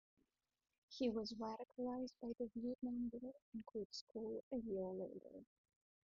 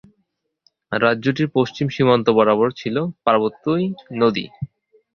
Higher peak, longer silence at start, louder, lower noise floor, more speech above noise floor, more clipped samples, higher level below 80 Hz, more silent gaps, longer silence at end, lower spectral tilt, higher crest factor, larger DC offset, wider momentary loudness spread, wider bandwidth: second, -30 dBFS vs -2 dBFS; about the same, 0.9 s vs 0.9 s; second, -48 LUFS vs -19 LUFS; first, -87 dBFS vs -71 dBFS; second, 40 dB vs 53 dB; neither; second, -76 dBFS vs -58 dBFS; first, 3.42-3.52 s, 3.85-3.90 s, 4.01-4.07 s, 4.43-4.51 s vs none; first, 0.65 s vs 0.5 s; second, -5.5 dB/octave vs -7.5 dB/octave; about the same, 18 dB vs 18 dB; neither; about the same, 11 LU vs 11 LU; about the same, 7 kHz vs 7 kHz